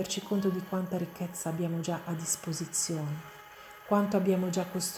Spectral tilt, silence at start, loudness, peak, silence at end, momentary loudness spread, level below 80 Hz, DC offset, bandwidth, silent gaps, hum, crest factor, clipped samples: -5 dB/octave; 0 s; -32 LUFS; -12 dBFS; 0 s; 12 LU; -70 dBFS; under 0.1%; over 20 kHz; none; none; 20 dB; under 0.1%